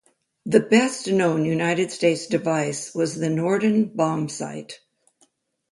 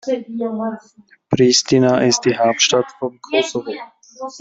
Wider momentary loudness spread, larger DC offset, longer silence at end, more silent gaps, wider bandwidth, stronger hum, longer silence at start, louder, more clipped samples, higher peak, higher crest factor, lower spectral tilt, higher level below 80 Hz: second, 13 LU vs 17 LU; neither; first, 0.95 s vs 0 s; neither; first, 11.5 kHz vs 8 kHz; neither; first, 0.45 s vs 0.05 s; second, -22 LUFS vs -17 LUFS; neither; about the same, -2 dBFS vs -2 dBFS; about the same, 20 dB vs 16 dB; first, -5.5 dB/octave vs -3.5 dB/octave; second, -66 dBFS vs -58 dBFS